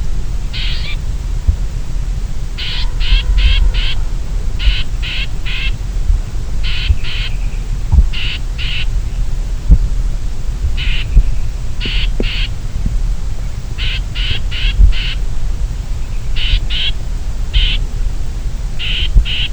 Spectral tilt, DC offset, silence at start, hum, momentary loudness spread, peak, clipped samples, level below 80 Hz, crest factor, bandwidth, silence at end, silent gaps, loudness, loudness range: -4.5 dB/octave; 0.6%; 0 s; none; 9 LU; 0 dBFS; 0.4%; -14 dBFS; 14 dB; 8.6 kHz; 0 s; none; -19 LUFS; 2 LU